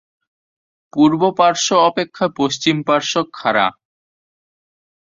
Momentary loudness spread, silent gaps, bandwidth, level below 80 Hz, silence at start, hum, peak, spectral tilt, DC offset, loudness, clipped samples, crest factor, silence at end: 6 LU; none; 7.6 kHz; -60 dBFS; 0.95 s; none; -2 dBFS; -4 dB/octave; under 0.1%; -16 LUFS; under 0.1%; 16 dB; 1.45 s